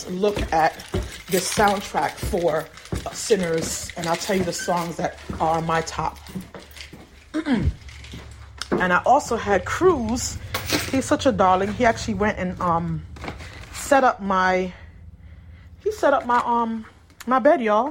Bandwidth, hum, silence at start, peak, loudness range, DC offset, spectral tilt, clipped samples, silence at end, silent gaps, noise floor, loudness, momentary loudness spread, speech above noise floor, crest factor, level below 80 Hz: 16.5 kHz; none; 0 s; -6 dBFS; 5 LU; under 0.1%; -4.5 dB/octave; under 0.1%; 0 s; none; -44 dBFS; -22 LUFS; 17 LU; 23 dB; 18 dB; -40 dBFS